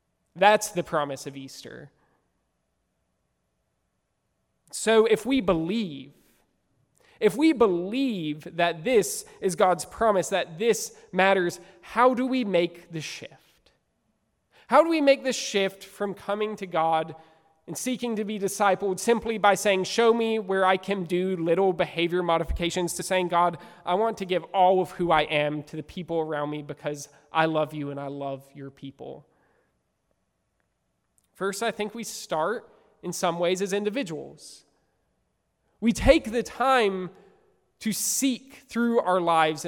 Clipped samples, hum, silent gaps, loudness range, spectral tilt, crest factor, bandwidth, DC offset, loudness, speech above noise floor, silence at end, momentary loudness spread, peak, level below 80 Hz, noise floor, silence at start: under 0.1%; none; none; 9 LU; -4 dB/octave; 24 dB; 17 kHz; under 0.1%; -25 LUFS; 51 dB; 0 s; 15 LU; -4 dBFS; -48 dBFS; -76 dBFS; 0.35 s